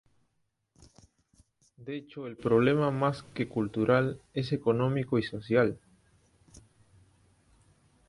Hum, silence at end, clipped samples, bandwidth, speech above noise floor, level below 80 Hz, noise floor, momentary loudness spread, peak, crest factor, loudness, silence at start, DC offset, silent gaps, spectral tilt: none; 2.3 s; under 0.1%; 11.5 kHz; 49 dB; -62 dBFS; -77 dBFS; 15 LU; -12 dBFS; 18 dB; -29 LUFS; 1.8 s; under 0.1%; none; -8 dB/octave